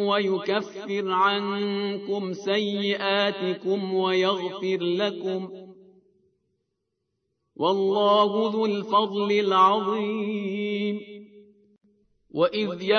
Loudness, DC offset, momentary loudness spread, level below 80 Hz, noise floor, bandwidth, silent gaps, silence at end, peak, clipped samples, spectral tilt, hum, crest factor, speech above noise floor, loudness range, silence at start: -24 LUFS; under 0.1%; 10 LU; -80 dBFS; -79 dBFS; 6.6 kHz; none; 0 s; -8 dBFS; under 0.1%; -6 dB/octave; none; 18 dB; 55 dB; 6 LU; 0 s